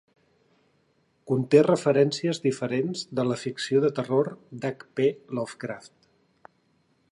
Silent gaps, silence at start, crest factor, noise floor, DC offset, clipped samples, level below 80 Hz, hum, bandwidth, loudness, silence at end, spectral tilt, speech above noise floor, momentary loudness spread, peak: none; 1.25 s; 20 dB; -68 dBFS; under 0.1%; under 0.1%; -74 dBFS; none; 11 kHz; -26 LUFS; 1.25 s; -6 dB/octave; 43 dB; 13 LU; -6 dBFS